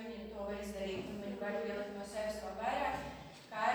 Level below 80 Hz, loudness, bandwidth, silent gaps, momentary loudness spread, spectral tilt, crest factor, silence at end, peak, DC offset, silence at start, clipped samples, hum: -60 dBFS; -41 LUFS; over 20 kHz; none; 8 LU; -4.5 dB/octave; 18 dB; 0 s; -22 dBFS; under 0.1%; 0 s; under 0.1%; none